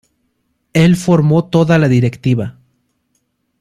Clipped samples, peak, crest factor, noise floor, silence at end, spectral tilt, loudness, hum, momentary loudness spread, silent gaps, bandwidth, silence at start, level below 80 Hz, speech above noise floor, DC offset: under 0.1%; 0 dBFS; 14 dB; -66 dBFS; 1.1 s; -7.5 dB/octave; -13 LUFS; none; 8 LU; none; 13 kHz; 0.75 s; -46 dBFS; 54 dB; under 0.1%